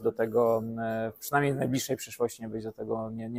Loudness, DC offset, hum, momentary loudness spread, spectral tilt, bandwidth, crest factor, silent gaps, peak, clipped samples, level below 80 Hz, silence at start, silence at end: -30 LUFS; under 0.1%; none; 9 LU; -5.5 dB/octave; 16 kHz; 18 dB; none; -12 dBFS; under 0.1%; -62 dBFS; 0 s; 0 s